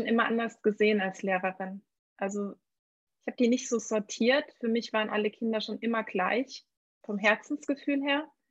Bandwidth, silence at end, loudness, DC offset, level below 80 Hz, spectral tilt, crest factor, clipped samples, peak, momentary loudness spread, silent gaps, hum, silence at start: 8.2 kHz; 0.25 s; -29 LUFS; under 0.1%; -80 dBFS; -4 dB/octave; 22 dB; under 0.1%; -10 dBFS; 13 LU; 1.99-2.16 s, 2.79-3.07 s, 6.77-7.01 s; none; 0 s